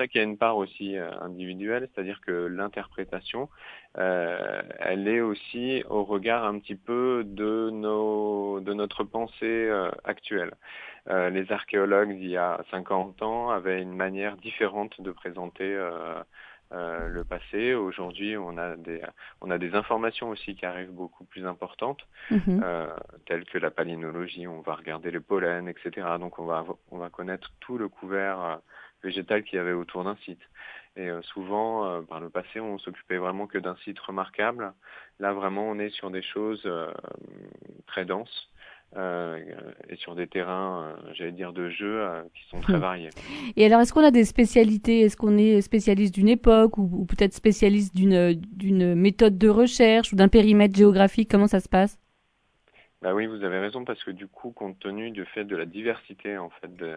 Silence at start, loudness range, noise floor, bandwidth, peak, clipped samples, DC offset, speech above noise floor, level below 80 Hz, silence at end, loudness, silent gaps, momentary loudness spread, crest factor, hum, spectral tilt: 0 s; 14 LU; -69 dBFS; 11 kHz; -4 dBFS; under 0.1%; under 0.1%; 44 dB; -44 dBFS; 0 s; -25 LUFS; none; 19 LU; 22 dB; none; -6.5 dB/octave